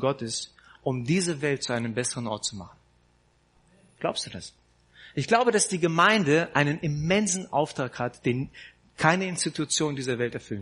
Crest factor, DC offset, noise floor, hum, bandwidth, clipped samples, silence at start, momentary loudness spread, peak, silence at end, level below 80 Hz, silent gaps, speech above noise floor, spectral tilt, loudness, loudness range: 24 dB; under 0.1%; -64 dBFS; 60 Hz at -60 dBFS; 10.5 kHz; under 0.1%; 0 s; 12 LU; -4 dBFS; 0 s; -60 dBFS; none; 38 dB; -4 dB/octave; -26 LUFS; 9 LU